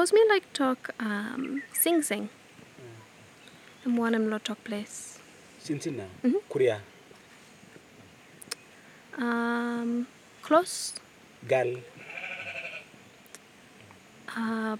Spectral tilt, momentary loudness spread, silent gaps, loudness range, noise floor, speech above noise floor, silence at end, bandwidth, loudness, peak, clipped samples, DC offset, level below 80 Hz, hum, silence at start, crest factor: -3.5 dB/octave; 24 LU; none; 5 LU; -54 dBFS; 26 dB; 0 s; 16.5 kHz; -29 LUFS; -8 dBFS; under 0.1%; under 0.1%; -80 dBFS; none; 0 s; 22 dB